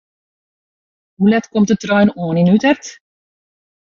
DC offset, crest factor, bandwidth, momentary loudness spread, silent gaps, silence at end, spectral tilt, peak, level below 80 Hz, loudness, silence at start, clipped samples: under 0.1%; 14 dB; 7.4 kHz; 5 LU; none; 0.95 s; -6.5 dB/octave; -2 dBFS; -54 dBFS; -15 LUFS; 1.2 s; under 0.1%